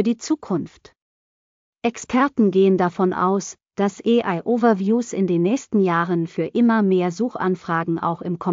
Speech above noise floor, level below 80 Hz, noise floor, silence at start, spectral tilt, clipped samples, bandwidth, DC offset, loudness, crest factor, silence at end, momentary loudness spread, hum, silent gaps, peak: over 70 dB; -64 dBFS; under -90 dBFS; 0 s; -6.5 dB/octave; under 0.1%; 7.6 kHz; under 0.1%; -20 LUFS; 14 dB; 0 s; 8 LU; none; 1.02-1.73 s; -6 dBFS